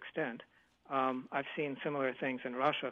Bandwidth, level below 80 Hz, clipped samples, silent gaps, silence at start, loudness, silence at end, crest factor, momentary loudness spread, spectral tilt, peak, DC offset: 6.8 kHz; -82 dBFS; under 0.1%; none; 0 s; -37 LUFS; 0 s; 20 dB; 5 LU; -7 dB/octave; -18 dBFS; under 0.1%